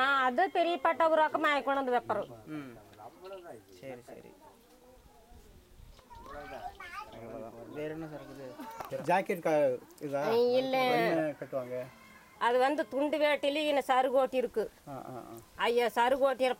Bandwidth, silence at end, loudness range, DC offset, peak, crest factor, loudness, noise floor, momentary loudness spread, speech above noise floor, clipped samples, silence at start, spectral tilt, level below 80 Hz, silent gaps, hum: 16 kHz; 0.05 s; 19 LU; under 0.1%; -14 dBFS; 18 dB; -30 LUFS; -59 dBFS; 20 LU; 27 dB; under 0.1%; 0 s; -4.5 dB/octave; -64 dBFS; none; none